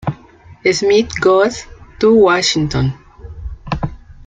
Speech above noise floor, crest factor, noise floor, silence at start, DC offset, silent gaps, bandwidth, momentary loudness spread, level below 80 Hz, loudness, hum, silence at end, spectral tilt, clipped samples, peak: 29 dB; 14 dB; -42 dBFS; 0.05 s; under 0.1%; none; 9.4 kHz; 21 LU; -36 dBFS; -14 LUFS; none; 0.15 s; -5 dB/octave; under 0.1%; -2 dBFS